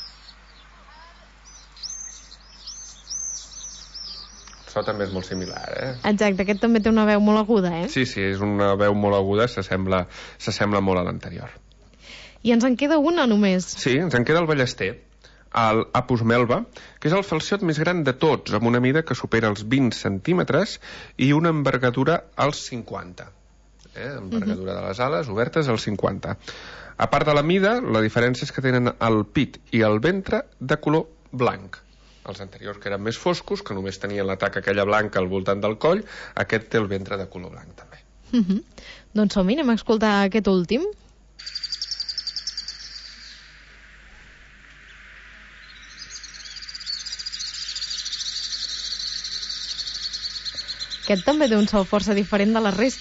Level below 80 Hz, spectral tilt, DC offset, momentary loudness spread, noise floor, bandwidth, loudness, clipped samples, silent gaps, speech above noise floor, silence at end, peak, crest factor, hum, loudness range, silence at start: -48 dBFS; -5.5 dB/octave; under 0.1%; 17 LU; -52 dBFS; 8 kHz; -22 LUFS; under 0.1%; none; 31 dB; 0 s; -8 dBFS; 16 dB; none; 11 LU; 0 s